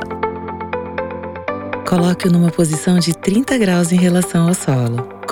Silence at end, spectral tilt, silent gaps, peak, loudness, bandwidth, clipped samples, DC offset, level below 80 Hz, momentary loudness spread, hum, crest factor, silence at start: 0 s; -6 dB/octave; none; 0 dBFS; -17 LUFS; 16.5 kHz; under 0.1%; under 0.1%; -48 dBFS; 11 LU; none; 16 dB; 0 s